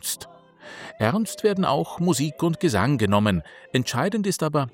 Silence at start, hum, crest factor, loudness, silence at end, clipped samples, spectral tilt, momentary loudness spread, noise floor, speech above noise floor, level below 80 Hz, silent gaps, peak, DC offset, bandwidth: 0.05 s; none; 18 dB; -23 LUFS; 0.05 s; under 0.1%; -5.5 dB/octave; 11 LU; -46 dBFS; 23 dB; -56 dBFS; none; -6 dBFS; under 0.1%; 17 kHz